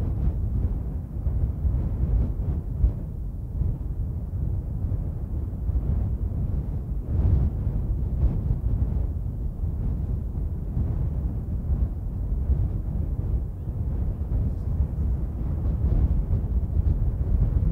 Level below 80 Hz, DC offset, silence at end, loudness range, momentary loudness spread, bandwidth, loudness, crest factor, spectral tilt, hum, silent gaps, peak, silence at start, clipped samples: -28 dBFS; under 0.1%; 0 s; 3 LU; 6 LU; 2.2 kHz; -28 LUFS; 16 dB; -11.5 dB/octave; none; none; -8 dBFS; 0 s; under 0.1%